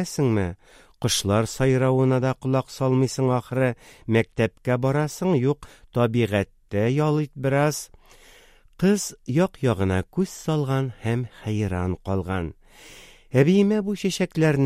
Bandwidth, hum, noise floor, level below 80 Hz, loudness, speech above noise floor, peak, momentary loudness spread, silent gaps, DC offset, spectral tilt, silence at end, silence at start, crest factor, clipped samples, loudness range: 15.5 kHz; none; -52 dBFS; -50 dBFS; -23 LUFS; 30 dB; -4 dBFS; 8 LU; none; under 0.1%; -6 dB/octave; 0 s; 0 s; 20 dB; under 0.1%; 3 LU